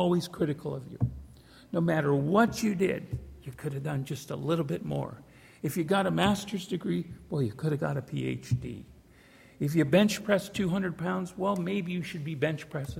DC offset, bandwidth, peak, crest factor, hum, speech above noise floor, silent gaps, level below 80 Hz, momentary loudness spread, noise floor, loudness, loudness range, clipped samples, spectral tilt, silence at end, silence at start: under 0.1%; 16.5 kHz; -10 dBFS; 20 dB; none; 27 dB; none; -54 dBFS; 12 LU; -56 dBFS; -30 LUFS; 4 LU; under 0.1%; -6.5 dB/octave; 0 s; 0 s